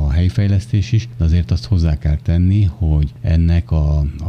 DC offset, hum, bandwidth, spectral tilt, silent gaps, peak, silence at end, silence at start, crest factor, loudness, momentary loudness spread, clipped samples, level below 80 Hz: under 0.1%; none; 6.8 kHz; -8 dB/octave; none; -4 dBFS; 0 s; 0 s; 10 dB; -17 LUFS; 3 LU; under 0.1%; -22 dBFS